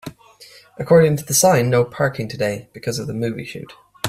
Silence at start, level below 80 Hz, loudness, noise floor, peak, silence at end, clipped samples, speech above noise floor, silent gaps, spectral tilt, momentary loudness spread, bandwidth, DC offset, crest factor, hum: 0.05 s; -54 dBFS; -18 LUFS; -46 dBFS; -2 dBFS; 0 s; under 0.1%; 28 dB; none; -4.5 dB/octave; 18 LU; 16 kHz; under 0.1%; 18 dB; none